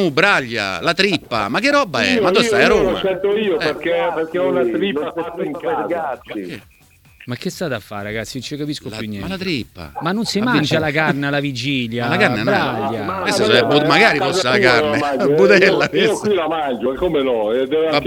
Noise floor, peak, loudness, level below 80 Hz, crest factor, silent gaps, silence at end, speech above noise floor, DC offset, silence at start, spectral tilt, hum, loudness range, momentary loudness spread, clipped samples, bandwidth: -48 dBFS; 0 dBFS; -17 LUFS; -46 dBFS; 18 dB; none; 0 s; 31 dB; under 0.1%; 0 s; -4.5 dB/octave; none; 11 LU; 13 LU; under 0.1%; 18.5 kHz